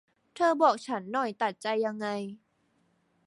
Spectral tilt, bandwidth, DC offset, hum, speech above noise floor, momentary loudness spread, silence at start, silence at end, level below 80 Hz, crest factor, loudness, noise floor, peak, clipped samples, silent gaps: -5 dB/octave; 11.5 kHz; under 0.1%; none; 43 dB; 10 LU; 0.35 s; 0.9 s; -80 dBFS; 20 dB; -29 LUFS; -71 dBFS; -10 dBFS; under 0.1%; none